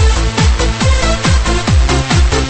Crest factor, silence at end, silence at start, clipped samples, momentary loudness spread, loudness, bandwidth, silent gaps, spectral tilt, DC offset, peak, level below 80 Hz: 10 dB; 0 s; 0 s; under 0.1%; 1 LU; -12 LUFS; 8.8 kHz; none; -4.5 dB/octave; under 0.1%; 0 dBFS; -14 dBFS